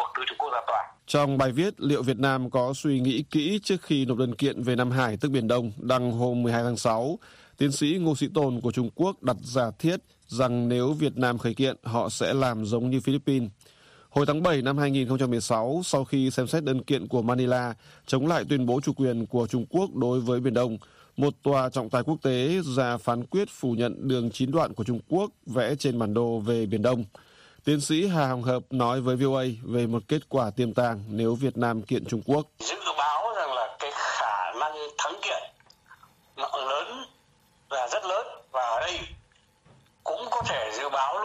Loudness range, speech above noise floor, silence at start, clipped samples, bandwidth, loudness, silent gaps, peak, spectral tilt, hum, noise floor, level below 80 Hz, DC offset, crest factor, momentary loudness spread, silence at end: 5 LU; 37 dB; 0 s; under 0.1%; 15 kHz; -27 LUFS; none; -8 dBFS; -6 dB/octave; none; -63 dBFS; -60 dBFS; under 0.1%; 18 dB; 6 LU; 0 s